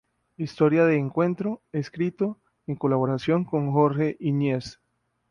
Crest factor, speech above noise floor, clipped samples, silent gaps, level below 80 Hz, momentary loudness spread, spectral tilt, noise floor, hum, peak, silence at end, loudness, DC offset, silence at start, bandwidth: 18 dB; 50 dB; under 0.1%; none; -62 dBFS; 12 LU; -8.5 dB/octave; -74 dBFS; none; -6 dBFS; 0.55 s; -25 LUFS; under 0.1%; 0.4 s; 9.8 kHz